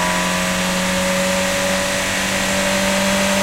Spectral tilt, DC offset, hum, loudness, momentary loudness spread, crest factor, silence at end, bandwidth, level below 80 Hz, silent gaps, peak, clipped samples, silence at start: -3 dB/octave; under 0.1%; none; -17 LUFS; 2 LU; 12 dB; 0 s; 16 kHz; -38 dBFS; none; -6 dBFS; under 0.1%; 0 s